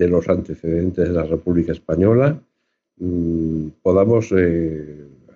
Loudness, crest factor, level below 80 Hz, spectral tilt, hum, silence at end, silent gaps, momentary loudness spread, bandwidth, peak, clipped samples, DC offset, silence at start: -19 LUFS; 14 dB; -40 dBFS; -9.5 dB/octave; none; 0.3 s; none; 10 LU; 7.2 kHz; -4 dBFS; under 0.1%; under 0.1%; 0 s